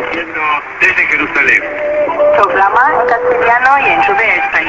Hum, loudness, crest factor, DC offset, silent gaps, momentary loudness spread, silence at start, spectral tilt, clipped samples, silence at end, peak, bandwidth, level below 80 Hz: none; -10 LUFS; 12 dB; under 0.1%; none; 6 LU; 0 s; -4 dB/octave; under 0.1%; 0 s; 0 dBFS; 8 kHz; -44 dBFS